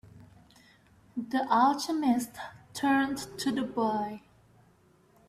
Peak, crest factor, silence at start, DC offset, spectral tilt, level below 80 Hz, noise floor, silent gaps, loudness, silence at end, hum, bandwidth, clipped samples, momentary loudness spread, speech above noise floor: -12 dBFS; 20 dB; 0.15 s; under 0.1%; -4 dB/octave; -68 dBFS; -63 dBFS; none; -29 LUFS; 1.1 s; none; 15 kHz; under 0.1%; 16 LU; 34 dB